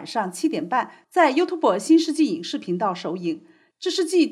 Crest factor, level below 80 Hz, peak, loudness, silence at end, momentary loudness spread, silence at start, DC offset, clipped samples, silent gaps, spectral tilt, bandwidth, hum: 16 dB; -86 dBFS; -6 dBFS; -22 LUFS; 0 s; 10 LU; 0 s; under 0.1%; under 0.1%; none; -4.5 dB/octave; 13 kHz; none